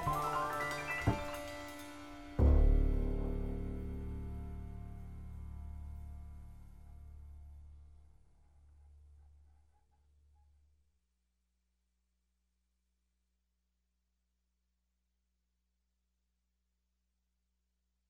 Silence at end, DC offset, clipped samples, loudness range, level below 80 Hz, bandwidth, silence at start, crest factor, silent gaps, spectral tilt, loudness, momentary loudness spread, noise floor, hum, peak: 8.8 s; under 0.1%; under 0.1%; 23 LU; -42 dBFS; 15.5 kHz; 0 s; 22 dB; none; -6.5 dB/octave; -38 LUFS; 23 LU; -83 dBFS; 60 Hz at -80 dBFS; -18 dBFS